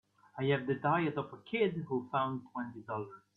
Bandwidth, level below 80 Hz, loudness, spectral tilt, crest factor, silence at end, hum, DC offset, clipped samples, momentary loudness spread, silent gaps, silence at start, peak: 4.3 kHz; -74 dBFS; -35 LUFS; -9 dB/octave; 18 dB; 0.2 s; none; under 0.1%; under 0.1%; 10 LU; none; 0.35 s; -18 dBFS